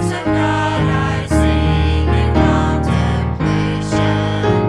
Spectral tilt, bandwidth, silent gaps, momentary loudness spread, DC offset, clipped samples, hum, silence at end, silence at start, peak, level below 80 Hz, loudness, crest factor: -7 dB/octave; 11.5 kHz; none; 4 LU; under 0.1%; under 0.1%; none; 0 s; 0 s; 0 dBFS; -24 dBFS; -16 LUFS; 14 dB